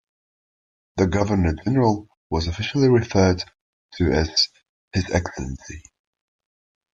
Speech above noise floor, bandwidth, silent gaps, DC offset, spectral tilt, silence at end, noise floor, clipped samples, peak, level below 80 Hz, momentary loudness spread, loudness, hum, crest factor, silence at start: over 70 dB; 7.8 kHz; 2.17-2.30 s, 3.61-3.89 s, 4.69-4.88 s; under 0.1%; -5.5 dB/octave; 1.15 s; under -90 dBFS; under 0.1%; -4 dBFS; -40 dBFS; 15 LU; -21 LUFS; none; 18 dB; 0.95 s